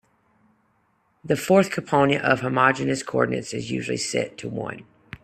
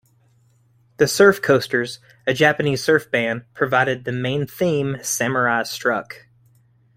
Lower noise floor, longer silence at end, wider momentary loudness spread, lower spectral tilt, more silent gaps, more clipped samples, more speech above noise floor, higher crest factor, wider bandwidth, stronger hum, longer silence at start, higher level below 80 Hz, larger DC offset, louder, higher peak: first, -66 dBFS vs -58 dBFS; second, 0.05 s vs 0.8 s; about the same, 12 LU vs 10 LU; about the same, -5 dB/octave vs -4.5 dB/octave; neither; neither; first, 44 dB vs 39 dB; about the same, 22 dB vs 20 dB; second, 14 kHz vs 16 kHz; neither; first, 1.25 s vs 1 s; about the same, -58 dBFS vs -58 dBFS; neither; second, -23 LUFS vs -19 LUFS; about the same, -2 dBFS vs -2 dBFS